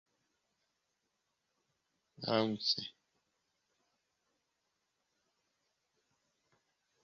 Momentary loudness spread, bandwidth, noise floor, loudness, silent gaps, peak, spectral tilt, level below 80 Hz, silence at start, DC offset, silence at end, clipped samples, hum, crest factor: 12 LU; 7.2 kHz; -84 dBFS; -35 LUFS; none; -18 dBFS; -3 dB/octave; -82 dBFS; 2.2 s; under 0.1%; 4.15 s; under 0.1%; none; 28 dB